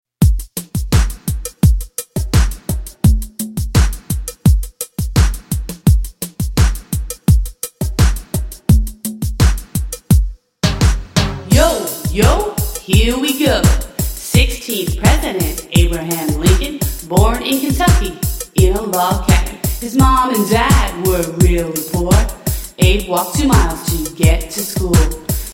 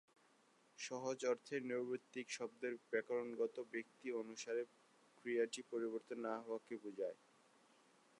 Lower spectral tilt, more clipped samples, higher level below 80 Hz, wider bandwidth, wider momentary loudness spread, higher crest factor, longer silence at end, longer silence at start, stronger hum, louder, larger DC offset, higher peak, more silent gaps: first, -5 dB/octave vs -3.5 dB/octave; neither; first, -18 dBFS vs under -90 dBFS; first, 17 kHz vs 11 kHz; first, 10 LU vs 7 LU; second, 14 dB vs 20 dB; second, 0 s vs 1.05 s; second, 0.2 s vs 0.8 s; neither; first, -16 LUFS vs -45 LUFS; neither; first, 0 dBFS vs -26 dBFS; neither